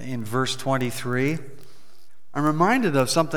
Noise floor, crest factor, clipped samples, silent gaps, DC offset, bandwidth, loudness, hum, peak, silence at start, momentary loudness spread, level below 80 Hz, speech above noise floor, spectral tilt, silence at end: -60 dBFS; 18 dB; under 0.1%; none; 2%; over 20 kHz; -23 LUFS; none; -6 dBFS; 0 s; 8 LU; -66 dBFS; 38 dB; -5 dB/octave; 0 s